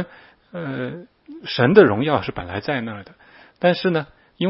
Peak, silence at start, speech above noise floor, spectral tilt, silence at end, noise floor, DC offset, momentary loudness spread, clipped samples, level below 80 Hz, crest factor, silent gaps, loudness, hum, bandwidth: 0 dBFS; 0 s; 28 dB; -10 dB/octave; 0 s; -47 dBFS; under 0.1%; 23 LU; under 0.1%; -54 dBFS; 20 dB; none; -19 LUFS; none; 5.8 kHz